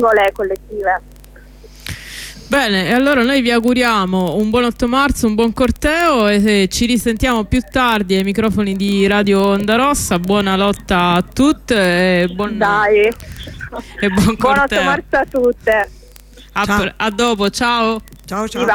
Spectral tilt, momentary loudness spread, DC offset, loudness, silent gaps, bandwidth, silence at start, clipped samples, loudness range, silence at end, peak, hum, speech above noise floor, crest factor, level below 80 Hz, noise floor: -5 dB/octave; 10 LU; under 0.1%; -15 LUFS; none; 18.5 kHz; 0 s; under 0.1%; 2 LU; 0 s; -2 dBFS; none; 25 dB; 12 dB; -34 dBFS; -40 dBFS